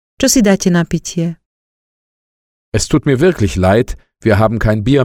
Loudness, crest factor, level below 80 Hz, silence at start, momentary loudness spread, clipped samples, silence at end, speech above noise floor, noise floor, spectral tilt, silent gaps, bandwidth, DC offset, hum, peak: -14 LUFS; 14 dB; -30 dBFS; 0.2 s; 9 LU; under 0.1%; 0 s; over 78 dB; under -90 dBFS; -5.5 dB/octave; 1.45-2.72 s; 17 kHz; under 0.1%; none; 0 dBFS